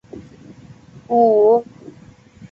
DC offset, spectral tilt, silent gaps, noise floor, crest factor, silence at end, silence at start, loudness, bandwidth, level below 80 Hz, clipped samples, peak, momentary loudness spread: under 0.1%; -9 dB/octave; none; -45 dBFS; 16 dB; 0.65 s; 0.15 s; -15 LUFS; 7 kHz; -58 dBFS; under 0.1%; -2 dBFS; 26 LU